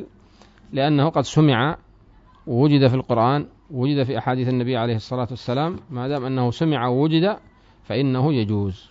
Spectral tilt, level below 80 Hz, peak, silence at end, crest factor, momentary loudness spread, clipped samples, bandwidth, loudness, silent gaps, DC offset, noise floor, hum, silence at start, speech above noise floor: -7.5 dB/octave; -52 dBFS; -4 dBFS; 0.15 s; 18 dB; 9 LU; under 0.1%; 7.8 kHz; -21 LUFS; none; under 0.1%; -51 dBFS; none; 0 s; 31 dB